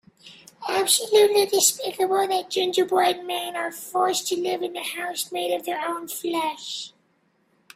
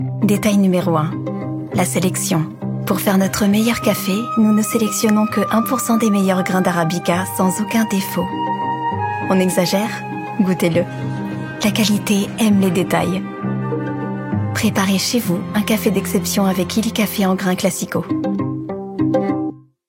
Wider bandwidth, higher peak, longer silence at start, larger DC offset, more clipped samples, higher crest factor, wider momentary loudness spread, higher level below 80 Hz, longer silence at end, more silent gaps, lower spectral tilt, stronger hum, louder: about the same, 16 kHz vs 17 kHz; second, -6 dBFS vs -2 dBFS; first, 0.25 s vs 0 s; neither; neither; about the same, 20 dB vs 16 dB; first, 11 LU vs 8 LU; second, -72 dBFS vs -54 dBFS; first, 0.9 s vs 0.3 s; neither; second, -1 dB/octave vs -5 dB/octave; neither; second, -23 LUFS vs -18 LUFS